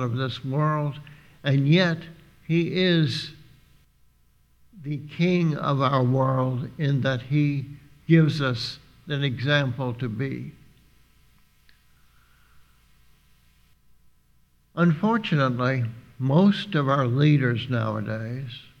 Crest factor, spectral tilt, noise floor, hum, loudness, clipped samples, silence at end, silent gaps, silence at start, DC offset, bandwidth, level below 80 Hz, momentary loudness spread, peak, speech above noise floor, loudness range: 20 dB; -7.5 dB/octave; -61 dBFS; 60 Hz at -50 dBFS; -24 LUFS; under 0.1%; 0.2 s; none; 0 s; under 0.1%; 8.4 kHz; -60 dBFS; 14 LU; -6 dBFS; 38 dB; 7 LU